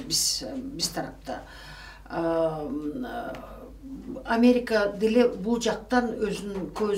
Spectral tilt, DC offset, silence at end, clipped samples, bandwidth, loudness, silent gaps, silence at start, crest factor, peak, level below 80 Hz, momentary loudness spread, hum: -3.5 dB/octave; under 0.1%; 0 s; under 0.1%; 16 kHz; -26 LUFS; none; 0 s; 18 dB; -8 dBFS; -50 dBFS; 20 LU; none